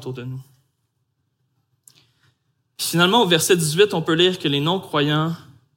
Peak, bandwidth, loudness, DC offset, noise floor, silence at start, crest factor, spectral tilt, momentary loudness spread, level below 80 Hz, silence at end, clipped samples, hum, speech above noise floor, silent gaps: -2 dBFS; 17 kHz; -18 LUFS; under 0.1%; -71 dBFS; 0 s; 20 dB; -4 dB/octave; 16 LU; -66 dBFS; 0.4 s; under 0.1%; none; 52 dB; none